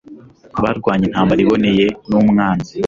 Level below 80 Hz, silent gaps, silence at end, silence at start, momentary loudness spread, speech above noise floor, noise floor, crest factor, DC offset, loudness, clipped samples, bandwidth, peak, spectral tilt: -42 dBFS; none; 0 s; 0.1 s; 6 LU; 25 dB; -40 dBFS; 12 dB; under 0.1%; -15 LUFS; under 0.1%; 7.2 kHz; -2 dBFS; -7.5 dB/octave